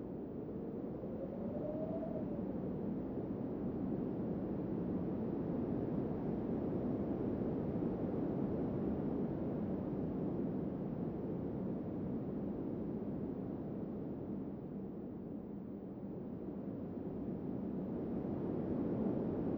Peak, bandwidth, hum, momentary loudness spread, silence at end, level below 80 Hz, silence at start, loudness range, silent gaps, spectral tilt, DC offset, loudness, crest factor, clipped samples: -24 dBFS; 4.9 kHz; none; 7 LU; 0 s; -58 dBFS; 0 s; 6 LU; none; -12 dB/octave; under 0.1%; -41 LUFS; 14 dB; under 0.1%